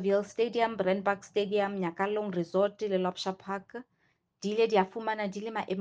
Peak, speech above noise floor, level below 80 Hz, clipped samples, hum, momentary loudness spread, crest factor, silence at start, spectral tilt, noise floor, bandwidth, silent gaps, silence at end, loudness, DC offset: -10 dBFS; 43 dB; -74 dBFS; under 0.1%; none; 10 LU; 20 dB; 0 s; -6 dB/octave; -74 dBFS; 9 kHz; none; 0 s; -31 LUFS; under 0.1%